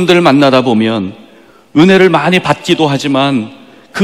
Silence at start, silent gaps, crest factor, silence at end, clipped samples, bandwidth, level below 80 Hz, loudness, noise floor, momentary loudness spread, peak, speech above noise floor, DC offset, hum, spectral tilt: 0 s; none; 10 dB; 0 s; 2%; 13.5 kHz; -50 dBFS; -10 LUFS; -42 dBFS; 12 LU; 0 dBFS; 32 dB; under 0.1%; none; -6 dB/octave